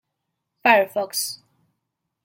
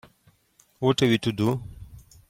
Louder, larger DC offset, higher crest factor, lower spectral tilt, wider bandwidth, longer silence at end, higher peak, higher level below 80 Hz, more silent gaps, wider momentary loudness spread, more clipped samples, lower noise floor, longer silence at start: first, -20 LUFS vs -24 LUFS; neither; about the same, 22 dB vs 18 dB; second, -1.5 dB/octave vs -6 dB/octave; about the same, 16.5 kHz vs 16.5 kHz; first, 0.9 s vs 0.3 s; first, -2 dBFS vs -8 dBFS; second, -78 dBFS vs -52 dBFS; neither; about the same, 12 LU vs 11 LU; neither; first, -79 dBFS vs -63 dBFS; second, 0.65 s vs 0.8 s